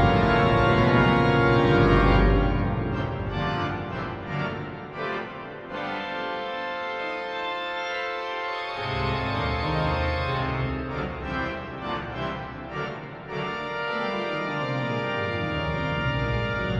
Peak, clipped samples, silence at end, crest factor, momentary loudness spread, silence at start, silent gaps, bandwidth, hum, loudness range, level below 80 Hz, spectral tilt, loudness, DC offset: -8 dBFS; under 0.1%; 0 s; 18 dB; 13 LU; 0 s; none; 8.8 kHz; none; 10 LU; -34 dBFS; -7.5 dB/octave; -26 LUFS; under 0.1%